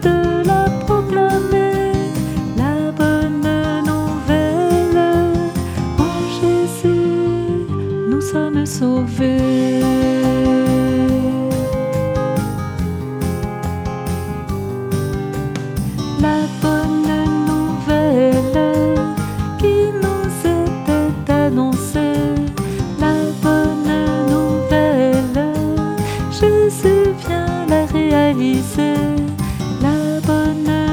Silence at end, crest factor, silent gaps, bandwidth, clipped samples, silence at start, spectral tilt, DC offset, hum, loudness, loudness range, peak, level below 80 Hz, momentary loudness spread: 0 s; 16 dB; none; 19 kHz; under 0.1%; 0 s; -7 dB/octave; under 0.1%; none; -17 LUFS; 4 LU; 0 dBFS; -32 dBFS; 7 LU